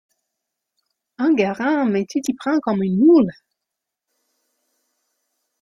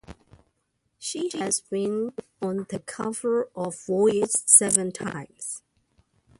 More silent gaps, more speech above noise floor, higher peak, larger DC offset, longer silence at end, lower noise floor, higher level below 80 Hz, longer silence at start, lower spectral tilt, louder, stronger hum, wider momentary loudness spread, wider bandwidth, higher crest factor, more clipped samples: neither; first, 65 dB vs 49 dB; about the same, -4 dBFS vs -2 dBFS; neither; first, 2.3 s vs 0.8 s; first, -83 dBFS vs -74 dBFS; about the same, -64 dBFS vs -62 dBFS; first, 1.2 s vs 0.1 s; first, -7 dB/octave vs -3 dB/octave; first, -18 LUFS vs -23 LUFS; neither; second, 9 LU vs 19 LU; about the same, 12 kHz vs 12 kHz; second, 16 dB vs 26 dB; neither